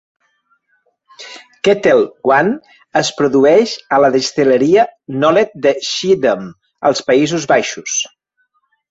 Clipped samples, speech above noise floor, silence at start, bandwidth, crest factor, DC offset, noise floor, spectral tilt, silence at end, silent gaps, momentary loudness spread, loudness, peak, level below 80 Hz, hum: under 0.1%; 51 dB; 1.2 s; 8 kHz; 14 dB; under 0.1%; -64 dBFS; -4 dB/octave; 0.85 s; none; 8 LU; -14 LUFS; 0 dBFS; -56 dBFS; none